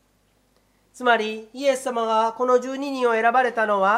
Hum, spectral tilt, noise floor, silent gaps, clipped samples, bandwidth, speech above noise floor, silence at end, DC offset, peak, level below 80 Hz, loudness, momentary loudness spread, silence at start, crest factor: none; -3.5 dB/octave; -64 dBFS; none; under 0.1%; 14 kHz; 43 dB; 0 s; under 0.1%; -4 dBFS; -70 dBFS; -22 LUFS; 6 LU; 0.95 s; 18 dB